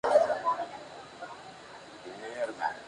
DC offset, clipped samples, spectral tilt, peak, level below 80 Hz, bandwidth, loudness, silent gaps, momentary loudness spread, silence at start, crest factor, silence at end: under 0.1%; under 0.1%; -3.5 dB/octave; -12 dBFS; -72 dBFS; 11 kHz; -31 LUFS; none; 21 LU; 0.05 s; 22 dB; 0 s